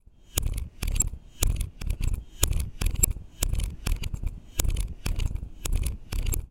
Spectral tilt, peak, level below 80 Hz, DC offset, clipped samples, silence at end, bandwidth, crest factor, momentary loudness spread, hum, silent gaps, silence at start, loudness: -3.5 dB/octave; 0 dBFS; -30 dBFS; under 0.1%; under 0.1%; 0.05 s; 17 kHz; 28 dB; 8 LU; none; none; 0.35 s; -31 LUFS